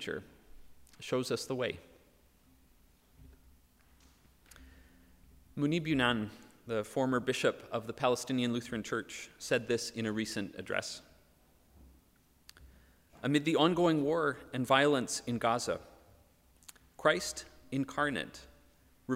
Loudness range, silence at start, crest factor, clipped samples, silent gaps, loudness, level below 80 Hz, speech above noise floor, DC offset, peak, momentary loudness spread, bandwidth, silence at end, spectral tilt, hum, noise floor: 10 LU; 0 s; 24 dB; under 0.1%; none; -33 LUFS; -64 dBFS; 34 dB; under 0.1%; -10 dBFS; 15 LU; 16 kHz; 0 s; -4.5 dB/octave; none; -67 dBFS